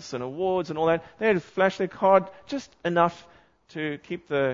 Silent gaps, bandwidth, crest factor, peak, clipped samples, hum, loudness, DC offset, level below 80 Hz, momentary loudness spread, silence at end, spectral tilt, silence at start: none; 7.6 kHz; 20 dB; -6 dBFS; under 0.1%; none; -26 LUFS; under 0.1%; -64 dBFS; 14 LU; 0 s; -6 dB/octave; 0 s